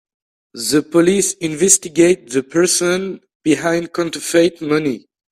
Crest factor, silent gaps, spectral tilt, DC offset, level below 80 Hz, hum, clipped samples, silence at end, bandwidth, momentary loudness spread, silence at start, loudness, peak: 16 dB; 3.35-3.40 s; -3.5 dB/octave; under 0.1%; -56 dBFS; none; under 0.1%; 0.35 s; 16 kHz; 10 LU; 0.55 s; -16 LUFS; 0 dBFS